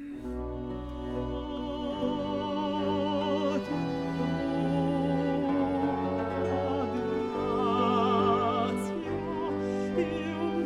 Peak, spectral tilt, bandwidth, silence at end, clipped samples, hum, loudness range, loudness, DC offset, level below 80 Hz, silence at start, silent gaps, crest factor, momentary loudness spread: -14 dBFS; -7.5 dB/octave; 12 kHz; 0 s; under 0.1%; none; 3 LU; -30 LUFS; under 0.1%; -48 dBFS; 0 s; none; 14 dB; 9 LU